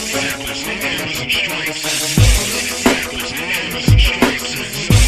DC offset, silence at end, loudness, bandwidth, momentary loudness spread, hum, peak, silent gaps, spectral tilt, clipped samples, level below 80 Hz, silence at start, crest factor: under 0.1%; 0 s; -16 LUFS; 14.5 kHz; 8 LU; none; 0 dBFS; none; -3.5 dB/octave; under 0.1%; -22 dBFS; 0 s; 16 dB